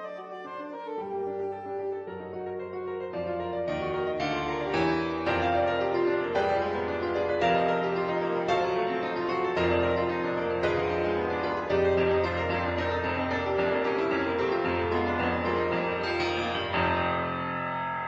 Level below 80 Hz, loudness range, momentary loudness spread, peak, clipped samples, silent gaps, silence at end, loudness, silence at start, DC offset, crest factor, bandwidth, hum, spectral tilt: -52 dBFS; 6 LU; 9 LU; -12 dBFS; under 0.1%; none; 0 s; -28 LUFS; 0 s; under 0.1%; 16 dB; 7.8 kHz; none; -6.5 dB/octave